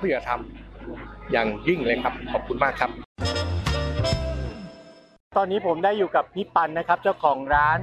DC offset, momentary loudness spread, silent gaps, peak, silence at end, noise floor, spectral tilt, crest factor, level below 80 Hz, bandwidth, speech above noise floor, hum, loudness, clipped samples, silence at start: under 0.1%; 16 LU; 3.05-3.16 s, 5.20-5.31 s; -6 dBFS; 0 s; -48 dBFS; -6 dB/octave; 18 dB; -38 dBFS; 13 kHz; 24 dB; none; -24 LUFS; under 0.1%; 0 s